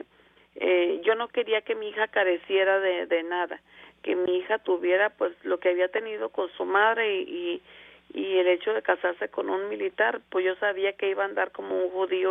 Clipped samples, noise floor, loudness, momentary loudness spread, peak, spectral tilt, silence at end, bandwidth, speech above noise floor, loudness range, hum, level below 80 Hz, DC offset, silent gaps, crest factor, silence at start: under 0.1%; -60 dBFS; -26 LUFS; 8 LU; -8 dBFS; -6.5 dB/octave; 0 s; 3.8 kHz; 34 dB; 2 LU; none; -74 dBFS; under 0.1%; none; 18 dB; 0.55 s